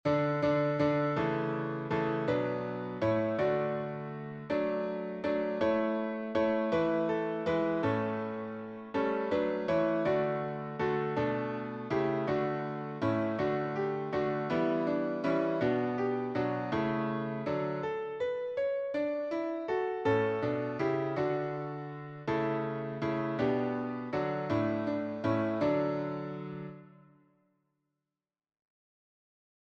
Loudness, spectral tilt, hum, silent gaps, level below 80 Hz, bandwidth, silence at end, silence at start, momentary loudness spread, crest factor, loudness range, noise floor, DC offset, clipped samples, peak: -32 LUFS; -8.5 dB/octave; none; none; -66 dBFS; 7.6 kHz; 2.8 s; 0.05 s; 7 LU; 16 dB; 2 LU; under -90 dBFS; under 0.1%; under 0.1%; -16 dBFS